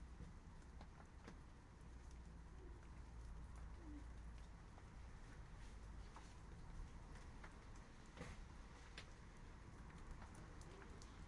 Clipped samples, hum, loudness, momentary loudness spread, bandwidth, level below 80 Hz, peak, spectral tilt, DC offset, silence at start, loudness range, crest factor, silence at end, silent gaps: under 0.1%; none; -60 LUFS; 4 LU; 11 kHz; -60 dBFS; -40 dBFS; -5.5 dB/octave; under 0.1%; 0 s; 1 LU; 18 dB; 0 s; none